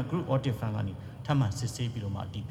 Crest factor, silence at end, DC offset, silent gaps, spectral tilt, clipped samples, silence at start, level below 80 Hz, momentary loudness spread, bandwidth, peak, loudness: 16 dB; 0 s; under 0.1%; none; -6.5 dB/octave; under 0.1%; 0 s; -54 dBFS; 8 LU; 14.5 kHz; -14 dBFS; -32 LUFS